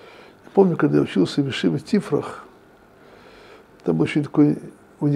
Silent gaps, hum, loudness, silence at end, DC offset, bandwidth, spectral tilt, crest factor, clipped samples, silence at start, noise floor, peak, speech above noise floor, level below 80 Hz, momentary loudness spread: none; none; -21 LUFS; 0 s; under 0.1%; 11.5 kHz; -7.5 dB/octave; 20 dB; under 0.1%; 0.55 s; -50 dBFS; -2 dBFS; 31 dB; -60 dBFS; 11 LU